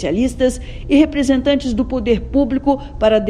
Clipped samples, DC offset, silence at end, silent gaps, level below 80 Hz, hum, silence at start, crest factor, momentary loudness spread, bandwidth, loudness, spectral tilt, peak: under 0.1%; under 0.1%; 0 s; none; -30 dBFS; none; 0 s; 14 dB; 5 LU; 11 kHz; -16 LUFS; -6 dB/octave; 0 dBFS